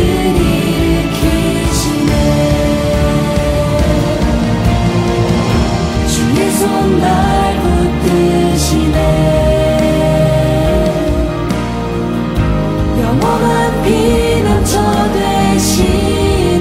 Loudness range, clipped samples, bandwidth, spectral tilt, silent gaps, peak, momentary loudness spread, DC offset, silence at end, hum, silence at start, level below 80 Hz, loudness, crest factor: 2 LU; under 0.1%; 16 kHz; -6 dB/octave; none; 0 dBFS; 3 LU; under 0.1%; 0 s; none; 0 s; -20 dBFS; -12 LUFS; 10 dB